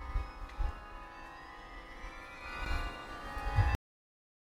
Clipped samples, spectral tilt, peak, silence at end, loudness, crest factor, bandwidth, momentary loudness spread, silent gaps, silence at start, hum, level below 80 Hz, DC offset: under 0.1%; -6 dB/octave; -16 dBFS; 0.75 s; -40 LUFS; 22 dB; 15.5 kHz; 16 LU; none; 0 s; none; -40 dBFS; under 0.1%